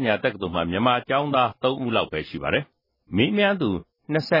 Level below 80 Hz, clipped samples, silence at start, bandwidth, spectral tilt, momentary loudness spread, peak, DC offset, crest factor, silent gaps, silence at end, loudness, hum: -56 dBFS; under 0.1%; 0 s; 5.8 kHz; -7.5 dB/octave; 8 LU; -6 dBFS; under 0.1%; 18 dB; none; 0 s; -23 LUFS; none